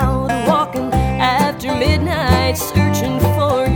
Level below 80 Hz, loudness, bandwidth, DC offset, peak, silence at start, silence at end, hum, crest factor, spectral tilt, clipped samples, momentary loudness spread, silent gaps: -26 dBFS; -16 LUFS; 19.5 kHz; under 0.1%; -2 dBFS; 0 s; 0 s; none; 14 dB; -5.5 dB/octave; under 0.1%; 3 LU; none